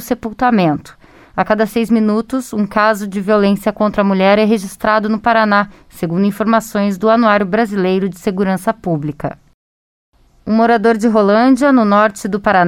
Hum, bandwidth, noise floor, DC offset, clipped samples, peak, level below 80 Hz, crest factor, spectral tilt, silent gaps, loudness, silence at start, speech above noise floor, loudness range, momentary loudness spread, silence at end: none; 16 kHz; under -90 dBFS; under 0.1%; under 0.1%; 0 dBFS; -46 dBFS; 14 dB; -6.5 dB/octave; 9.54-10.12 s; -14 LUFS; 0 s; over 77 dB; 3 LU; 9 LU; 0 s